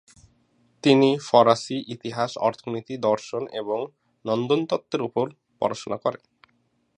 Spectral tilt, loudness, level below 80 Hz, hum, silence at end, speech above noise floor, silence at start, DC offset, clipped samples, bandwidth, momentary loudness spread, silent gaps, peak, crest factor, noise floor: -5.5 dB/octave; -24 LUFS; -70 dBFS; none; 0.8 s; 45 dB; 0.85 s; under 0.1%; under 0.1%; 10 kHz; 13 LU; none; -2 dBFS; 22 dB; -68 dBFS